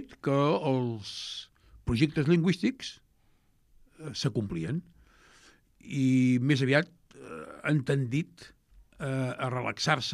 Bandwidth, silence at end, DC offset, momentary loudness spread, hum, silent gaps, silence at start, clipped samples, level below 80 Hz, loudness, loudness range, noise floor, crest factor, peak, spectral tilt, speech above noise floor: 12 kHz; 0 s; under 0.1%; 16 LU; none; none; 0 s; under 0.1%; -56 dBFS; -29 LUFS; 5 LU; -66 dBFS; 20 dB; -10 dBFS; -6 dB/octave; 37 dB